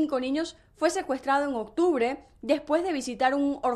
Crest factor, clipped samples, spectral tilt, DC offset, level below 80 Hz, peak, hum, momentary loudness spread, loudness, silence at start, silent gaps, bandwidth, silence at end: 16 dB; under 0.1%; -3.5 dB/octave; under 0.1%; -60 dBFS; -10 dBFS; none; 6 LU; -27 LUFS; 0 s; none; 13 kHz; 0 s